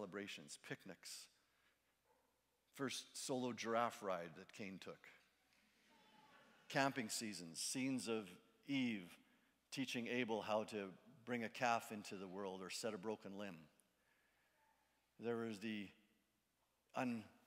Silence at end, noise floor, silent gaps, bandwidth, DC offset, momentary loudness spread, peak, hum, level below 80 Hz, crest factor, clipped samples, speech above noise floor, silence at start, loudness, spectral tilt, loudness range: 0.15 s; -85 dBFS; none; 16 kHz; under 0.1%; 15 LU; -22 dBFS; none; under -90 dBFS; 26 dB; under 0.1%; 39 dB; 0 s; -46 LUFS; -3.5 dB/octave; 7 LU